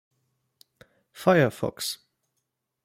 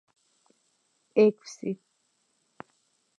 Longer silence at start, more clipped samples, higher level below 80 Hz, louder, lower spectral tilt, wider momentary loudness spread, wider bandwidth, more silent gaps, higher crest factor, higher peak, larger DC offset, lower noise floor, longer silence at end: about the same, 1.15 s vs 1.15 s; neither; first, -66 dBFS vs -86 dBFS; about the same, -25 LUFS vs -27 LUFS; second, -5 dB/octave vs -6.5 dB/octave; second, 11 LU vs 28 LU; first, 16.5 kHz vs 8.8 kHz; neither; about the same, 24 dB vs 22 dB; first, -6 dBFS vs -10 dBFS; neither; first, -80 dBFS vs -73 dBFS; second, 0.9 s vs 1.45 s